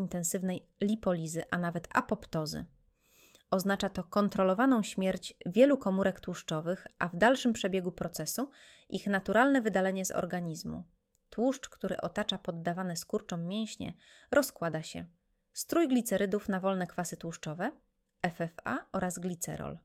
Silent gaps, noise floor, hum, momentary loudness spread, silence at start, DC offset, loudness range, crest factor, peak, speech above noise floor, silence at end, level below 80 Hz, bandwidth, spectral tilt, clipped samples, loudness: none; -66 dBFS; none; 13 LU; 0 s; under 0.1%; 6 LU; 22 dB; -12 dBFS; 34 dB; 0.05 s; -62 dBFS; 16.5 kHz; -5 dB/octave; under 0.1%; -32 LUFS